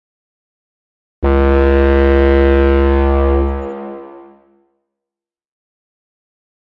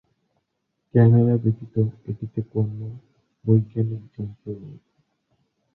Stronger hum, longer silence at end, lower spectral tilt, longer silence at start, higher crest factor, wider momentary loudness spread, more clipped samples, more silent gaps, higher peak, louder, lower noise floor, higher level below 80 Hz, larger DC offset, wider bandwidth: neither; first, 2.55 s vs 1 s; second, -10 dB/octave vs -13.5 dB/octave; first, 1.2 s vs 0.95 s; second, 14 dB vs 20 dB; second, 15 LU vs 19 LU; neither; neither; about the same, -2 dBFS vs -4 dBFS; first, -13 LUFS vs -22 LUFS; first, -87 dBFS vs -76 dBFS; first, -20 dBFS vs -54 dBFS; neither; first, 4.8 kHz vs 2.1 kHz